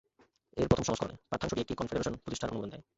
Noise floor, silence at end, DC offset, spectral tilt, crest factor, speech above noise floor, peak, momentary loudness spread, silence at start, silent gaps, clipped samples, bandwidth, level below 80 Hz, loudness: -67 dBFS; 0.15 s; under 0.1%; -5.5 dB/octave; 24 dB; 33 dB; -10 dBFS; 8 LU; 0.55 s; none; under 0.1%; 8.2 kHz; -52 dBFS; -34 LUFS